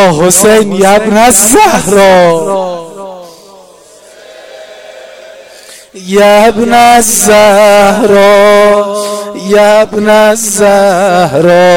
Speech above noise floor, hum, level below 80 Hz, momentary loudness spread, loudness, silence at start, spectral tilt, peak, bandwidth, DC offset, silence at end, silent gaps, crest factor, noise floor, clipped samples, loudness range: 31 dB; none; -38 dBFS; 11 LU; -5 LUFS; 0 s; -3.5 dB/octave; 0 dBFS; over 20 kHz; under 0.1%; 0 s; none; 6 dB; -36 dBFS; 2%; 9 LU